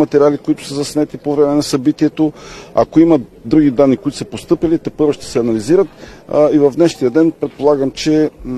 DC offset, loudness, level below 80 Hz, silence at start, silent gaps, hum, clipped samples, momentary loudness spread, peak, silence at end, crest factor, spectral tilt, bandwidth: under 0.1%; -14 LUFS; -42 dBFS; 0 s; none; none; under 0.1%; 8 LU; 0 dBFS; 0 s; 14 dB; -6.5 dB/octave; 12.5 kHz